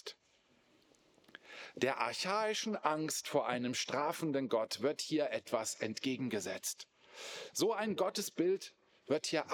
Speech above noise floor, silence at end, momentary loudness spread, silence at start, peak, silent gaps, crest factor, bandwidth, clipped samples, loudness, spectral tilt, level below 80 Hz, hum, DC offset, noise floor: 35 dB; 0 s; 13 LU; 0.05 s; -16 dBFS; none; 22 dB; over 20 kHz; under 0.1%; -36 LUFS; -3.5 dB/octave; under -90 dBFS; none; under 0.1%; -72 dBFS